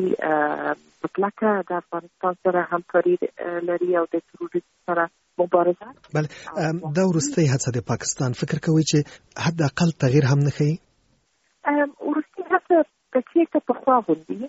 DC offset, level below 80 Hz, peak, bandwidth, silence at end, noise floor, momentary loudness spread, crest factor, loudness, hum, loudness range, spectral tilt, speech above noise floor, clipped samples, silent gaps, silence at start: under 0.1%; -60 dBFS; -6 dBFS; 8 kHz; 0 s; -66 dBFS; 9 LU; 18 dB; -23 LUFS; none; 2 LU; -6 dB/octave; 44 dB; under 0.1%; none; 0 s